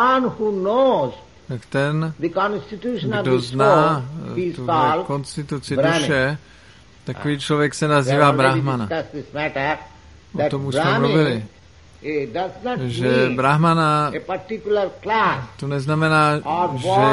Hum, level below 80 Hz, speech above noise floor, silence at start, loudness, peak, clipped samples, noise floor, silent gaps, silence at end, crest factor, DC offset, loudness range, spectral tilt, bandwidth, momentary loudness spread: none; -52 dBFS; 28 dB; 0 s; -20 LUFS; 0 dBFS; under 0.1%; -47 dBFS; none; 0 s; 20 dB; 0.2%; 3 LU; -6 dB/octave; 11.5 kHz; 12 LU